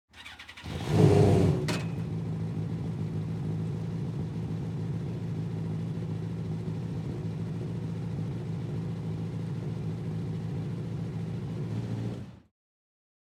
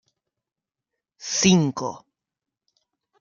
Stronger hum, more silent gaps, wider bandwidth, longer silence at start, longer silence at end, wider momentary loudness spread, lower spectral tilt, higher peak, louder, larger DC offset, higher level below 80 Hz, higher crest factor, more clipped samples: neither; neither; first, 12.5 kHz vs 7.6 kHz; second, 0.15 s vs 1.2 s; second, 0.85 s vs 1.2 s; second, 10 LU vs 16 LU; first, -8 dB/octave vs -4 dB/octave; second, -8 dBFS vs -4 dBFS; second, -32 LUFS vs -21 LUFS; neither; first, -54 dBFS vs -60 dBFS; about the same, 24 dB vs 22 dB; neither